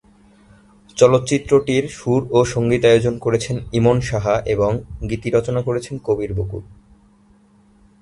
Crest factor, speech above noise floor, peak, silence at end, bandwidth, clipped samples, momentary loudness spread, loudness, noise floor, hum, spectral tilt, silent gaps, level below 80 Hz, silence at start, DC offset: 18 dB; 35 dB; 0 dBFS; 1.3 s; 11.5 kHz; under 0.1%; 11 LU; -18 LUFS; -53 dBFS; none; -6 dB/octave; none; -40 dBFS; 0.95 s; under 0.1%